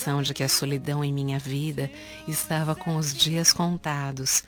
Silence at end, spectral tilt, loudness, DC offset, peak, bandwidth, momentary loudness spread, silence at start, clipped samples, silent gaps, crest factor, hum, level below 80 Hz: 0.05 s; -3.5 dB/octave; -25 LUFS; under 0.1%; -6 dBFS; over 20 kHz; 10 LU; 0 s; under 0.1%; none; 22 dB; none; -56 dBFS